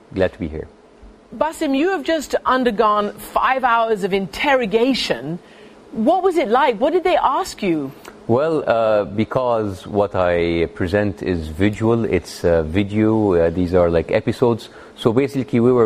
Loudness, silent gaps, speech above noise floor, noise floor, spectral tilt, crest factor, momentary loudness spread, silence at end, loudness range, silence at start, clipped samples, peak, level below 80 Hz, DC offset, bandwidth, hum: -18 LUFS; none; 27 dB; -45 dBFS; -6.5 dB/octave; 16 dB; 7 LU; 0 s; 2 LU; 0.15 s; under 0.1%; -2 dBFS; -42 dBFS; under 0.1%; 15.5 kHz; none